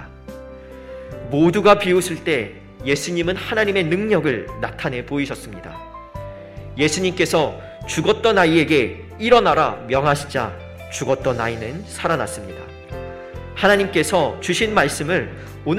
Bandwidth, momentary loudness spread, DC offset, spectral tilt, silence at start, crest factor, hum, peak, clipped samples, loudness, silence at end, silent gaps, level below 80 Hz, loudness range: 16 kHz; 20 LU; under 0.1%; -4.5 dB/octave; 0 s; 20 dB; none; 0 dBFS; under 0.1%; -19 LUFS; 0 s; none; -44 dBFS; 6 LU